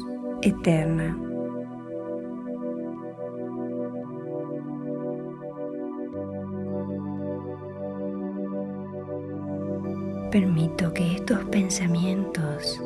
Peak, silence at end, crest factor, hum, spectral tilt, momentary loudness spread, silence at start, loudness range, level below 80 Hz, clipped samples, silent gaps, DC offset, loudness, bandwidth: -8 dBFS; 0 s; 20 dB; none; -6 dB/octave; 11 LU; 0 s; 8 LU; -52 dBFS; under 0.1%; none; under 0.1%; -29 LUFS; 12.5 kHz